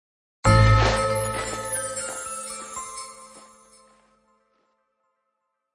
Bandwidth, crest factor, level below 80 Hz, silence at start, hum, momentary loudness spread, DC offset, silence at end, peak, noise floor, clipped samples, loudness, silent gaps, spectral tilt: 11.5 kHz; 20 dB; -34 dBFS; 0.45 s; none; 18 LU; under 0.1%; 2.35 s; -4 dBFS; -78 dBFS; under 0.1%; -23 LUFS; none; -4.5 dB/octave